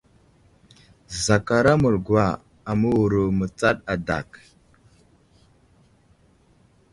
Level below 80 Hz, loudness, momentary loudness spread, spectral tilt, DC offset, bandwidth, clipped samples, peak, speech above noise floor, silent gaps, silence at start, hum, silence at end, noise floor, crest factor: -46 dBFS; -22 LUFS; 10 LU; -6 dB/octave; under 0.1%; 11.5 kHz; under 0.1%; -4 dBFS; 37 dB; none; 1.1 s; none; 2.55 s; -58 dBFS; 22 dB